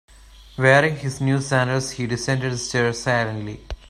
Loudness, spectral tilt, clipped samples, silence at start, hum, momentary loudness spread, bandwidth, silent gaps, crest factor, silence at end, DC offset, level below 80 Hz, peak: -21 LUFS; -5 dB/octave; under 0.1%; 0.4 s; none; 11 LU; 12.5 kHz; none; 20 dB; 0 s; under 0.1%; -44 dBFS; -2 dBFS